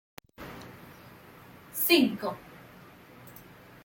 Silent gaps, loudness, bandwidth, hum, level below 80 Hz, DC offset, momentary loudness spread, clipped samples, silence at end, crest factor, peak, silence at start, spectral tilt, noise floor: none; -26 LUFS; 17 kHz; none; -66 dBFS; under 0.1%; 28 LU; under 0.1%; 0.45 s; 26 dB; -8 dBFS; 0.4 s; -3.5 dB/octave; -52 dBFS